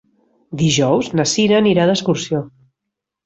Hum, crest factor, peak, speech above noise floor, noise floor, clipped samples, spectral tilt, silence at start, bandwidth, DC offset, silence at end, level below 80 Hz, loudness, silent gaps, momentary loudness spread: none; 14 dB; -2 dBFS; 65 dB; -81 dBFS; under 0.1%; -5 dB/octave; 0.5 s; 8.2 kHz; under 0.1%; 0.75 s; -54 dBFS; -16 LUFS; none; 10 LU